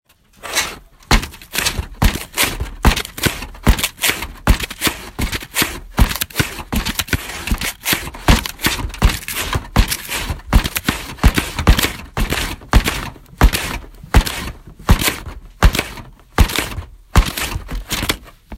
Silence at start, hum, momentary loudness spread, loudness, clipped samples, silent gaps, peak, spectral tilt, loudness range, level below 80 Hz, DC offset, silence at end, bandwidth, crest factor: 0.45 s; none; 9 LU; -19 LUFS; under 0.1%; none; 0 dBFS; -3.5 dB/octave; 2 LU; -20 dBFS; under 0.1%; 0 s; 16.5 kHz; 18 dB